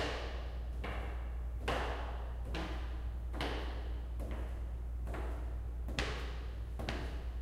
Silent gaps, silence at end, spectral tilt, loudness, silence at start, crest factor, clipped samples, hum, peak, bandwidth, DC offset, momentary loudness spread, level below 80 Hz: none; 0 s; -5.5 dB/octave; -42 LUFS; 0 s; 24 dB; under 0.1%; none; -16 dBFS; 12 kHz; under 0.1%; 5 LU; -40 dBFS